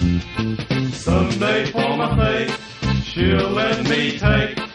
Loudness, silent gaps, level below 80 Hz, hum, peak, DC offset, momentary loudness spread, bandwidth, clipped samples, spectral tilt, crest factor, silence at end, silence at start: -19 LUFS; none; -30 dBFS; none; -2 dBFS; under 0.1%; 5 LU; 11.5 kHz; under 0.1%; -6 dB/octave; 16 dB; 0 s; 0 s